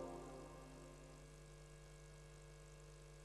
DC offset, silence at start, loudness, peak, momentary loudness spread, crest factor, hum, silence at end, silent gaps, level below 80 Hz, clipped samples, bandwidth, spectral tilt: under 0.1%; 0 s; -59 LUFS; -40 dBFS; 6 LU; 18 dB; none; 0 s; none; -64 dBFS; under 0.1%; 12 kHz; -5 dB/octave